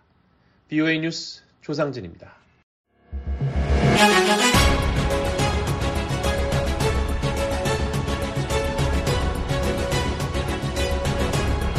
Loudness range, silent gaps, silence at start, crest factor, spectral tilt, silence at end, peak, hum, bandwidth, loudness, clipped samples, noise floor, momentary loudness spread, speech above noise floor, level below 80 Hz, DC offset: 7 LU; 2.63-2.84 s; 0.7 s; 20 dB; -5 dB/octave; 0 s; -4 dBFS; none; 14 kHz; -22 LUFS; under 0.1%; -60 dBFS; 11 LU; 35 dB; -28 dBFS; under 0.1%